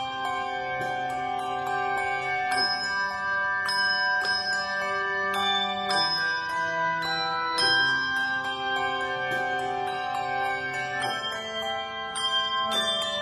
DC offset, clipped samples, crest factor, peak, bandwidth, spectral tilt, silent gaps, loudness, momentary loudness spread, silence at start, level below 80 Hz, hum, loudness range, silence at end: under 0.1%; under 0.1%; 16 dB; -12 dBFS; 14 kHz; -2 dB/octave; none; -26 LUFS; 6 LU; 0 s; -62 dBFS; none; 4 LU; 0 s